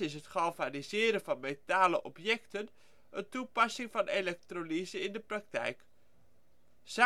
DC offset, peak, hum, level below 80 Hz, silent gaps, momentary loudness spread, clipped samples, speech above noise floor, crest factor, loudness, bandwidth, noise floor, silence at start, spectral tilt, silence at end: 0.1%; -12 dBFS; none; -76 dBFS; none; 12 LU; under 0.1%; 37 dB; 24 dB; -34 LUFS; 15.5 kHz; -72 dBFS; 0 s; -3.5 dB/octave; 0 s